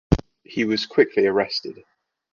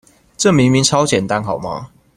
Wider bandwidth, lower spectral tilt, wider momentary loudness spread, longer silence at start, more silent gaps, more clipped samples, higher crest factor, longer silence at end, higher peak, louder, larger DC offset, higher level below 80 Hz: second, 7.2 kHz vs 14.5 kHz; first, -6 dB/octave vs -4.5 dB/octave; about the same, 12 LU vs 13 LU; second, 0.1 s vs 0.4 s; neither; neither; first, 22 dB vs 16 dB; first, 0.6 s vs 0.3 s; about the same, 0 dBFS vs 0 dBFS; second, -22 LUFS vs -15 LUFS; neither; first, -36 dBFS vs -46 dBFS